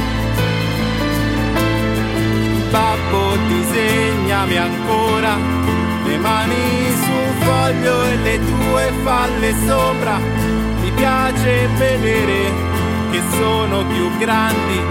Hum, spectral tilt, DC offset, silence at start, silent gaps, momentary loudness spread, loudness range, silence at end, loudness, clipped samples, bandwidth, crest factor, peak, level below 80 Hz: none; -5.5 dB/octave; under 0.1%; 0 s; none; 3 LU; 1 LU; 0 s; -16 LUFS; under 0.1%; 16.5 kHz; 14 dB; -2 dBFS; -28 dBFS